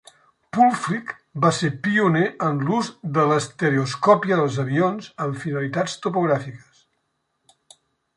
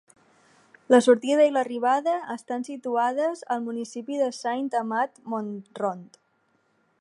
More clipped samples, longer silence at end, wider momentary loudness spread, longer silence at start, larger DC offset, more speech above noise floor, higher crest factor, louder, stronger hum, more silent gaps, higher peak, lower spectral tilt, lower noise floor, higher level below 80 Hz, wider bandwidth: neither; first, 1.6 s vs 0.95 s; second, 9 LU vs 13 LU; second, 0.55 s vs 0.9 s; neither; first, 52 dB vs 44 dB; about the same, 20 dB vs 20 dB; first, -21 LUFS vs -25 LUFS; neither; neither; about the same, -2 dBFS vs -4 dBFS; first, -6 dB/octave vs -4.5 dB/octave; first, -73 dBFS vs -69 dBFS; first, -64 dBFS vs -84 dBFS; about the same, 11.5 kHz vs 11.5 kHz